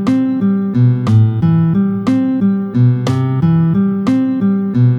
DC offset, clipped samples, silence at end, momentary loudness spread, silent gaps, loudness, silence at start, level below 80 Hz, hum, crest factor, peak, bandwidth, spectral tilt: under 0.1%; under 0.1%; 0 s; 3 LU; none; -13 LUFS; 0 s; -48 dBFS; none; 10 dB; -2 dBFS; 7.8 kHz; -9.5 dB/octave